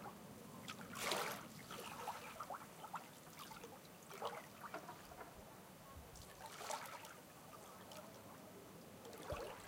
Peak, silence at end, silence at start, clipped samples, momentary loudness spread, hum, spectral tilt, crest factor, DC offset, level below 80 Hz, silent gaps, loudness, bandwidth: -24 dBFS; 0 s; 0 s; under 0.1%; 11 LU; none; -3 dB/octave; 28 dB; under 0.1%; -72 dBFS; none; -51 LUFS; 17 kHz